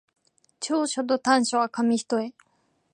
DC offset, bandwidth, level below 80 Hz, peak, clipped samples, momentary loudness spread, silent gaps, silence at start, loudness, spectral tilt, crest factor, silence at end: under 0.1%; 11 kHz; -78 dBFS; -6 dBFS; under 0.1%; 8 LU; none; 0.6 s; -25 LUFS; -3 dB/octave; 20 dB; 0.65 s